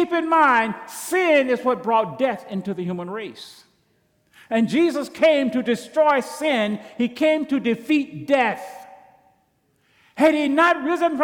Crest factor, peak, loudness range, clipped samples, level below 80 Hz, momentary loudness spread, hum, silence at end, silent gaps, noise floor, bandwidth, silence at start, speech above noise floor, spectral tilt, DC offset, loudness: 14 dB; -8 dBFS; 4 LU; under 0.1%; -70 dBFS; 12 LU; none; 0 s; none; -65 dBFS; 19 kHz; 0 s; 45 dB; -5 dB/octave; under 0.1%; -20 LUFS